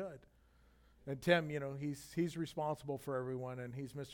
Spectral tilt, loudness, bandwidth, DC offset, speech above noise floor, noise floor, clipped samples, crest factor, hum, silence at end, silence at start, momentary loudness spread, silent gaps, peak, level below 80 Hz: -6 dB/octave; -40 LUFS; 18 kHz; under 0.1%; 29 dB; -68 dBFS; under 0.1%; 24 dB; none; 0 s; 0 s; 14 LU; none; -16 dBFS; -68 dBFS